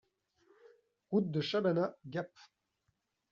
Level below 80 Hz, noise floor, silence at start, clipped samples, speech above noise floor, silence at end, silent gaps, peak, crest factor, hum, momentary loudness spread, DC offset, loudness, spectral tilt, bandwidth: -80 dBFS; -82 dBFS; 1.1 s; under 0.1%; 47 dB; 1.05 s; none; -20 dBFS; 18 dB; none; 10 LU; under 0.1%; -35 LUFS; -5.5 dB/octave; 7.4 kHz